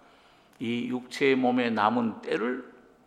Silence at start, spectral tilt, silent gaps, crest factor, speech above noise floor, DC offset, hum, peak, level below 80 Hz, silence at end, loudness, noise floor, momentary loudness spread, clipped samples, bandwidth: 0.6 s; -5.5 dB/octave; none; 20 dB; 31 dB; under 0.1%; none; -8 dBFS; -74 dBFS; 0.35 s; -27 LUFS; -58 dBFS; 9 LU; under 0.1%; 11 kHz